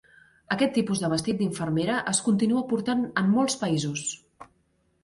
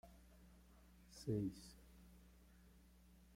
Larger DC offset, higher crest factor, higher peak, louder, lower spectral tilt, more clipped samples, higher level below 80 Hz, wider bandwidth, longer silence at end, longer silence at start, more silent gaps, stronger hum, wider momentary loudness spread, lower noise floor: neither; about the same, 18 dB vs 22 dB; first, -10 dBFS vs -30 dBFS; first, -26 LUFS vs -47 LUFS; second, -4.5 dB/octave vs -7 dB/octave; neither; first, -62 dBFS vs -68 dBFS; second, 11.5 kHz vs 16.5 kHz; first, 0.6 s vs 0.2 s; first, 0.5 s vs 0.05 s; neither; neither; second, 7 LU vs 24 LU; about the same, -69 dBFS vs -67 dBFS